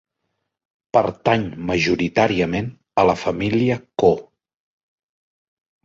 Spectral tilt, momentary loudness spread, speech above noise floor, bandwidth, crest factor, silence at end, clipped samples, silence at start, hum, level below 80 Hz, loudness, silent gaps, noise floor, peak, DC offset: -6 dB/octave; 5 LU; 57 dB; 7.8 kHz; 20 dB; 1.65 s; under 0.1%; 0.95 s; none; -48 dBFS; -20 LUFS; none; -76 dBFS; -2 dBFS; under 0.1%